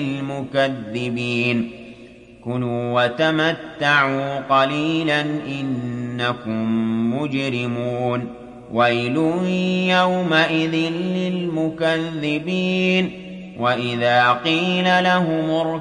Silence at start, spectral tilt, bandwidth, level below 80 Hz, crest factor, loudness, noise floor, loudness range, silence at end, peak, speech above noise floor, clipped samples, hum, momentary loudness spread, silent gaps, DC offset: 0 s; -6 dB/octave; 9.8 kHz; -58 dBFS; 18 dB; -20 LUFS; -43 dBFS; 4 LU; 0 s; -2 dBFS; 23 dB; under 0.1%; none; 9 LU; none; under 0.1%